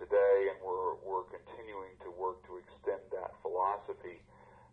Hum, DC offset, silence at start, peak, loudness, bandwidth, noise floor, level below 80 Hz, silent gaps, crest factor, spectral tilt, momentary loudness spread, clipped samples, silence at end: none; under 0.1%; 0 s; -18 dBFS; -35 LUFS; 4.1 kHz; -59 dBFS; -68 dBFS; none; 18 dB; -7 dB/octave; 20 LU; under 0.1%; 0.55 s